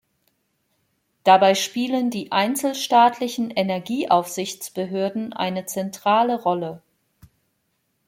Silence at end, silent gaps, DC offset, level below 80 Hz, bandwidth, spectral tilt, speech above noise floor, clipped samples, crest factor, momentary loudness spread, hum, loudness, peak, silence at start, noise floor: 1.3 s; none; under 0.1%; -70 dBFS; 16.5 kHz; -4 dB/octave; 51 dB; under 0.1%; 20 dB; 11 LU; none; -21 LUFS; -2 dBFS; 1.25 s; -71 dBFS